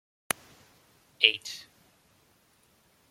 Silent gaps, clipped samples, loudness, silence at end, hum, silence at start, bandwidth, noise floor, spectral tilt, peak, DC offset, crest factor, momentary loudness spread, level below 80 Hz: none; under 0.1%; -27 LUFS; 1.5 s; none; 1.2 s; 16.5 kHz; -65 dBFS; 0.5 dB/octave; -2 dBFS; under 0.1%; 32 dB; 18 LU; -78 dBFS